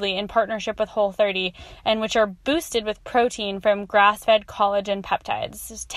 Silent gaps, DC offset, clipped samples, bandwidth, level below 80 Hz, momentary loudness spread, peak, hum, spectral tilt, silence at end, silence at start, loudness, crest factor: none; under 0.1%; under 0.1%; 14.5 kHz; -50 dBFS; 9 LU; -4 dBFS; none; -3.5 dB/octave; 0 s; 0 s; -22 LUFS; 18 dB